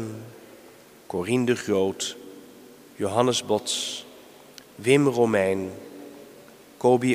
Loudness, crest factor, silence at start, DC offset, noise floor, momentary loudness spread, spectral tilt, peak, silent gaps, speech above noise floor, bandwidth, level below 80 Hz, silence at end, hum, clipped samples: -24 LUFS; 22 dB; 0 s; under 0.1%; -50 dBFS; 24 LU; -4.5 dB/octave; -4 dBFS; none; 27 dB; 15.5 kHz; -68 dBFS; 0 s; none; under 0.1%